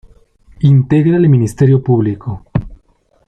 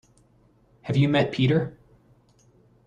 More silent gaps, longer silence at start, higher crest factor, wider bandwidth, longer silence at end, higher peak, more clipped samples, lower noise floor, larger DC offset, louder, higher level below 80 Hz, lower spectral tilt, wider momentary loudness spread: neither; second, 0.6 s vs 0.85 s; second, 10 dB vs 18 dB; first, 9.8 kHz vs 7.8 kHz; second, 0.5 s vs 1.15 s; first, -2 dBFS vs -8 dBFS; neither; second, -54 dBFS vs -60 dBFS; neither; first, -12 LUFS vs -23 LUFS; first, -38 dBFS vs -58 dBFS; first, -9.5 dB/octave vs -8 dB/octave; about the same, 11 LU vs 13 LU